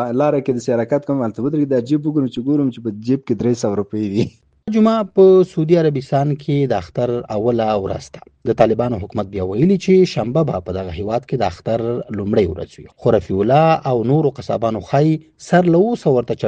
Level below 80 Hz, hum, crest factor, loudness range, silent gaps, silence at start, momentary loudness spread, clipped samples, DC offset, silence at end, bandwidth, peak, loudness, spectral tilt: -48 dBFS; none; 16 dB; 3 LU; none; 0 s; 9 LU; under 0.1%; under 0.1%; 0 s; 8.8 kHz; 0 dBFS; -17 LUFS; -8 dB/octave